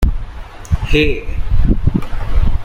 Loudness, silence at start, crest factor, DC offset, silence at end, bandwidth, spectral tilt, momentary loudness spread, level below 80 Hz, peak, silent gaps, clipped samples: -18 LUFS; 0 s; 12 dB; under 0.1%; 0 s; 7.2 kHz; -7 dB/octave; 14 LU; -16 dBFS; 0 dBFS; none; under 0.1%